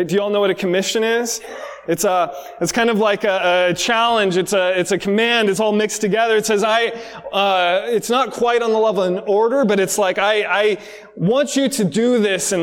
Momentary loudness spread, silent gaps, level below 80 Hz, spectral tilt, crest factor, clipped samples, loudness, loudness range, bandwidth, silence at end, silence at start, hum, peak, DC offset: 7 LU; none; -58 dBFS; -3.5 dB/octave; 14 dB; under 0.1%; -17 LUFS; 2 LU; 18 kHz; 0 s; 0 s; none; -2 dBFS; under 0.1%